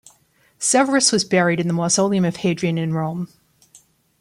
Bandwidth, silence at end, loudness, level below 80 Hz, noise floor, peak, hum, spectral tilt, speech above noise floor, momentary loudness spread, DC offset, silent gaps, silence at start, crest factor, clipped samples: 15 kHz; 0.95 s; -18 LUFS; -62 dBFS; -58 dBFS; -2 dBFS; none; -4 dB/octave; 40 dB; 9 LU; under 0.1%; none; 0.6 s; 18 dB; under 0.1%